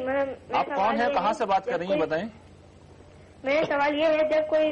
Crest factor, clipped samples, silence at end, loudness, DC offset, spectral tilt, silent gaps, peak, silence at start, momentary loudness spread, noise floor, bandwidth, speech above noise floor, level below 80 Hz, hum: 12 dB; under 0.1%; 0 s; -25 LUFS; under 0.1%; -5.5 dB/octave; none; -14 dBFS; 0 s; 6 LU; -50 dBFS; 8.8 kHz; 25 dB; -58 dBFS; none